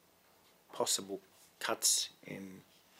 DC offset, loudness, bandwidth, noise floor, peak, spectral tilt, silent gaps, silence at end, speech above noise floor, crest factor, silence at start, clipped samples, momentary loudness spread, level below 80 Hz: under 0.1%; -33 LUFS; 16 kHz; -67 dBFS; -16 dBFS; -0.5 dB/octave; none; 0.4 s; 31 dB; 24 dB; 0.7 s; under 0.1%; 19 LU; -86 dBFS